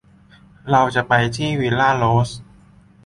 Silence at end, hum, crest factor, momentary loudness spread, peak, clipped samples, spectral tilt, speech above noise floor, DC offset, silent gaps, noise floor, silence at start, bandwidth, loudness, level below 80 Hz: 0.6 s; none; 18 dB; 10 LU; -2 dBFS; under 0.1%; -6 dB/octave; 32 dB; under 0.1%; none; -49 dBFS; 0.65 s; 11.5 kHz; -18 LUFS; -46 dBFS